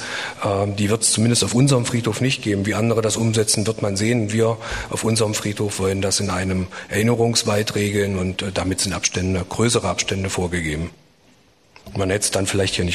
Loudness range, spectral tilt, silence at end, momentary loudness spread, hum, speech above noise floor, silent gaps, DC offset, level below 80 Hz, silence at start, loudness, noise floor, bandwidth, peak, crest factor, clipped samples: 4 LU; -4 dB/octave; 0 s; 7 LU; none; 35 dB; none; 0.1%; -44 dBFS; 0 s; -20 LUFS; -55 dBFS; 13 kHz; -4 dBFS; 16 dB; under 0.1%